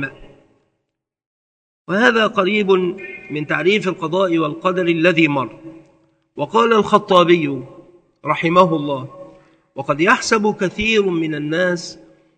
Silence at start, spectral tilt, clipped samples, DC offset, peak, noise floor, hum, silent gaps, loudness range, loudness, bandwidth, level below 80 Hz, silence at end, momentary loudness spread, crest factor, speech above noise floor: 0 s; -5 dB/octave; under 0.1%; under 0.1%; 0 dBFS; -77 dBFS; none; 1.26-1.85 s; 2 LU; -17 LUFS; 9.2 kHz; -52 dBFS; 0.45 s; 14 LU; 18 dB; 60 dB